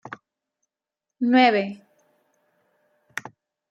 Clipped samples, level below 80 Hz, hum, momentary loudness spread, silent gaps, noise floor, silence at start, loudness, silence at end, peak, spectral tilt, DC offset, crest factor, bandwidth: under 0.1%; -80 dBFS; none; 25 LU; none; -87 dBFS; 0.05 s; -20 LUFS; 0.4 s; -4 dBFS; -5 dB/octave; under 0.1%; 22 dB; 8.2 kHz